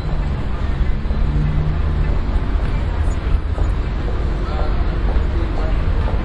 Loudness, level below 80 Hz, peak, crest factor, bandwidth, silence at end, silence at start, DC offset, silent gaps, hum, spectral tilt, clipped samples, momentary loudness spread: -21 LUFS; -18 dBFS; -4 dBFS; 14 dB; 7.4 kHz; 0 s; 0 s; under 0.1%; none; none; -8 dB/octave; under 0.1%; 3 LU